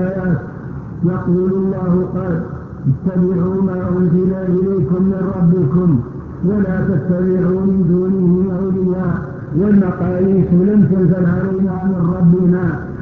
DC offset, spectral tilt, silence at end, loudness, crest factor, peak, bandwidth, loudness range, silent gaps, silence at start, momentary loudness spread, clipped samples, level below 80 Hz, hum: under 0.1%; -12.5 dB/octave; 0 s; -15 LUFS; 12 dB; -2 dBFS; 2.5 kHz; 3 LU; none; 0 s; 8 LU; under 0.1%; -36 dBFS; none